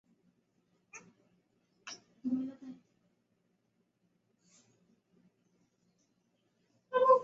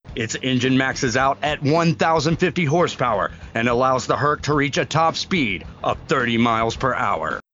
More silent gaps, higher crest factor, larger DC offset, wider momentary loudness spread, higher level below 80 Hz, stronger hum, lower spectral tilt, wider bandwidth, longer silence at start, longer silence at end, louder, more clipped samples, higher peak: neither; first, 26 dB vs 16 dB; neither; first, 24 LU vs 6 LU; second, -88 dBFS vs -44 dBFS; neither; second, -3.5 dB/octave vs -5 dB/octave; about the same, 7.6 kHz vs 7.6 kHz; first, 0.95 s vs 0.05 s; second, 0 s vs 0.15 s; second, -34 LUFS vs -20 LUFS; neither; second, -12 dBFS vs -4 dBFS